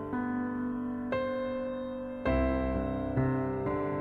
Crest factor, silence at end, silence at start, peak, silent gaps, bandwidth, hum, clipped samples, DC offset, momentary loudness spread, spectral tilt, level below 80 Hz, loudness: 14 dB; 0 s; 0 s; -16 dBFS; none; 4.5 kHz; none; under 0.1%; under 0.1%; 6 LU; -10 dB/octave; -42 dBFS; -32 LUFS